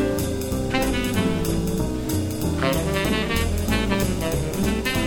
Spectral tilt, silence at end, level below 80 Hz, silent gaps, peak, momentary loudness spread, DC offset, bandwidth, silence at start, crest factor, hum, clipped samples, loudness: -5 dB/octave; 0 s; -32 dBFS; none; -6 dBFS; 3 LU; under 0.1%; 18 kHz; 0 s; 16 dB; none; under 0.1%; -23 LUFS